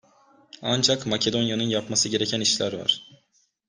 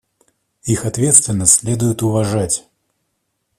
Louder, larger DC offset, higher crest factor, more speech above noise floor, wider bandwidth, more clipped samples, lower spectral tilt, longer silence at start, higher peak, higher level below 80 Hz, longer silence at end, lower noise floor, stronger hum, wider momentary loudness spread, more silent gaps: second, -23 LUFS vs -14 LUFS; neither; about the same, 20 dB vs 18 dB; second, 43 dB vs 55 dB; second, 11 kHz vs 16 kHz; neither; second, -3 dB/octave vs -4.5 dB/octave; about the same, 0.6 s vs 0.65 s; second, -6 dBFS vs 0 dBFS; second, -64 dBFS vs -48 dBFS; second, 0.55 s vs 1 s; second, -67 dBFS vs -71 dBFS; neither; second, 5 LU vs 10 LU; neither